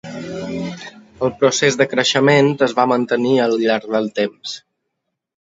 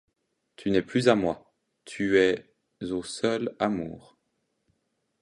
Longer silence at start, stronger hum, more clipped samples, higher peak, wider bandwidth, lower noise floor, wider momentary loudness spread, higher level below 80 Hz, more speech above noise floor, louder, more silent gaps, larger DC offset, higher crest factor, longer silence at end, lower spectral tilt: second, 0.05 s vs 0.6 s; neither; neither; first, 0 dBFS vs -6 dBFS; second, 8 kHz vs 11.5 kHz; about the same, -77 dBFS vs -77 dBFS; about the same, 16 LU vs 16 LU; about the same, -58 dBFS vs -60 dBFS; first, 60 dB vs 51 dB; first, -17 LUFS vs -27 LUFS; neither; neither; about the same, 18 dB vs 22 dB; second, 0.85 s vs 1.2 s; about the same, -4.5 dB/octave vs -5.5 dB/octave